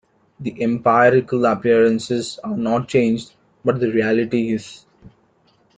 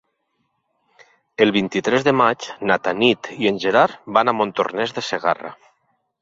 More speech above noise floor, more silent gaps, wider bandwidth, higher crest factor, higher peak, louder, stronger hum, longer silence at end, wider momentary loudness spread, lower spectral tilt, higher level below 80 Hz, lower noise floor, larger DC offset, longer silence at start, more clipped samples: second, 41 dB vs 52 dB; neither; first, 9.4 kHz vs 7.8 kHz; about the same, 18 dB vs 20 dB; about the same, -2 dBFS vs -2 dBFS; about the same, -18 LUFS vs -19 LUFS; neither; about the same, 0.7 s vs 0.7 s; first, 12 LU vs 7 LU; first, -6.5 dB/octave vs -5 dB/octave; about the same, -58 dBFS vs -62 dBFS; second, -59 dBFS vs -71 dBFS; neither; second, 0.4 s vs 1.4 s; neither